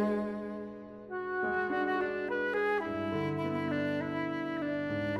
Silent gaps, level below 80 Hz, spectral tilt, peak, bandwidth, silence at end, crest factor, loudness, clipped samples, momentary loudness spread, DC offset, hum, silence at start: none; -64 dBFS; -7.5 dB/octave; -20 dBFS; 12 kHz; 0 s; 12 dB; -33 LUFS; under 0.1%; 9 LU; under 0.1%; none; 0 s